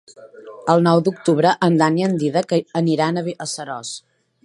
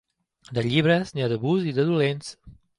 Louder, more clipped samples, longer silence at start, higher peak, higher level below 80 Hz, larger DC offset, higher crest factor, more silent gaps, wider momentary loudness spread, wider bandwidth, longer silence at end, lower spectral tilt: first, -19 LUFS vs -24 LUFS; neither; second, 0.2 s vs 0.5 s; first, 0 dBFS vs -6 dBFS; second, -68 dBFS vs -58 dBFS; neither; about the same, 18 dB vs 18 dB; neither; about the same, 12 LU vs 11 LU; about the same, 11.5 kHz vs 11 kHz; first, 0.45 s vs 0.25 s; about the same, -6 dB/octave vs -6.5 dB/octave